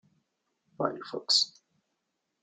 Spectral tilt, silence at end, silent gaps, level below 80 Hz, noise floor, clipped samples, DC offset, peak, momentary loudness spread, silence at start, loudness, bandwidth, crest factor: -2 dB/octave; 0.95 s; none; -80 dBFS; -82 dBFS; under 0.1%; under 0.1%; -12 dBFS; 10 LU; 0.8 s; -28 LUFS; 12 kHz; 22 dB